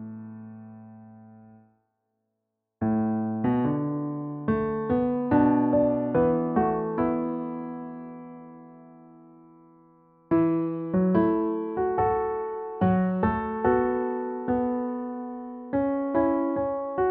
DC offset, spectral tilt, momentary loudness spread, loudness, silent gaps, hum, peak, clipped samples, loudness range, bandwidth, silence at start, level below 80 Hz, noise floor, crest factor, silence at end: under 0.1%; -9 dB/octave; 17 LU; -26 LUFS; none; none; -10 dBFS; under 0.1%; 8 LU; 3.9 kHz; 0 s; -52 dBFS; -82 dBFS; 16 dB; 0 s